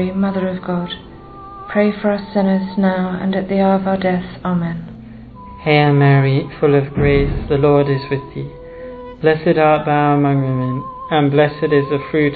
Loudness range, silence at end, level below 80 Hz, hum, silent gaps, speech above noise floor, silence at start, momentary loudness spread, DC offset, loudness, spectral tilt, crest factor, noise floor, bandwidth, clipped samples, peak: 4 LU; 0 s; -36 dBFS; none; none; 20 dB; 0 s; 18 LU; under 0.1%; -16 LUFS; -11 dB/octave; 16 dB; -35 dBFS; 4.8 kHz; under 0.1%; 0 dBFS